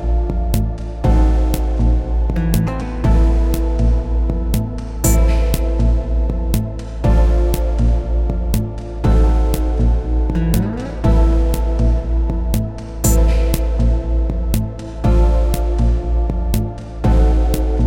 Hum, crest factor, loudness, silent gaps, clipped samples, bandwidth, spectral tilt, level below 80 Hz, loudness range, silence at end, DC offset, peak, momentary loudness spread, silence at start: none; 14 dB; -18 LUFS; none; under 0.1%; 17 kHz; -7 dB/octave; -16 dBFS; 1 LU; 0 s; under 0.1%; 0 dBFS; 6 LU; 0 s